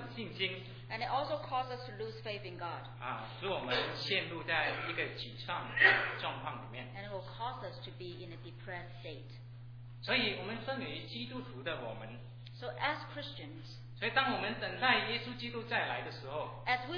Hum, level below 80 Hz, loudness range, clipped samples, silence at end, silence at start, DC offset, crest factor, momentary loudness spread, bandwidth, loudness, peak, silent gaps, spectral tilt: none; -62 dBFS; 9 LU; under 0.1%; 0 s; 0 s; under 0.1%; 26 dB; 16 LU; 5.4 kHz; -36 LUFS; -12 dBFS; none; -6 dB/octave